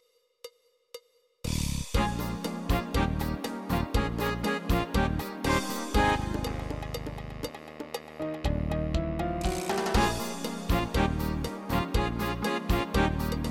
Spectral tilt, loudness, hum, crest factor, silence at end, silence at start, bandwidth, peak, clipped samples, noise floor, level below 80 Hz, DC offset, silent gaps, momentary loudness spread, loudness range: -5.5 dB/octave; -30 LUFS; none; 18 dB; 0 s; 0.45 s; 17 kHz; -12 dBFS; under 0.1%; -51 dBFS; -36 dBFS; under 0.1%; none; 12 LU; 4 LU